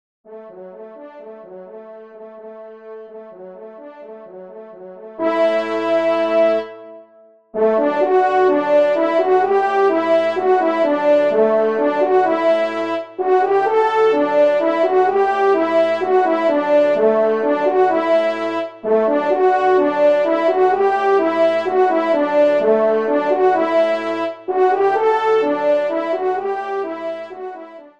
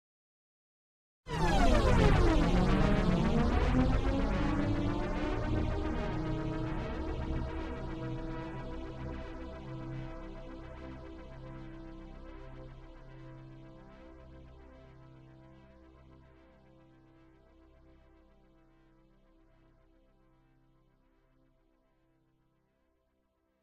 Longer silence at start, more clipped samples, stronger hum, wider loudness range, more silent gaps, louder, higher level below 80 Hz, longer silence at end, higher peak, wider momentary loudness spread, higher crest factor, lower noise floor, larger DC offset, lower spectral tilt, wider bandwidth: second, 0.3 s vs 1.25 s; neither; neither; second, 11 LU vs 24 LU; neither; first, -16 LUFS vs -33 LUFS; second, -72 dBFS vs -38 dBFS; second, 0.15 s vs 8.1 s; first, -4 dBFS vs -12 dBFS; second, 21 LU vs 25 LU; second, 12 dB vs 22 dB; second, -49 dBFS vs -76 dBFS; first, 0.2% vs under 0.1%; about the same, -6 dB/octave vs -7 dB/octave; second, 8 kHz vs 11 kHz